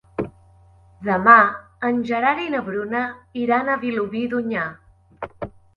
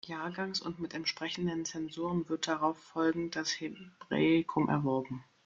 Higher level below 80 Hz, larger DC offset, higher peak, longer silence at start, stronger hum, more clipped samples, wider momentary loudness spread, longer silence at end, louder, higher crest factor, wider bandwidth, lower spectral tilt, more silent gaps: first, -56 dBFS vs -68 dBFS; neither; first, 0 dBFS vs -16 dBFS; first, 0.2 s vs 0.05 s; neither; neither; first, 21 LU vs 10 LU; about the same, 0.25 s vs 0.25 s; first, -20 LUFS vs -34 LUFS; about the same, 22 dB vs 18 dB; about the same, 7 kHz vs 7.6 kHz; first, -7.5 dB/octave vs -5 dB/octave; neither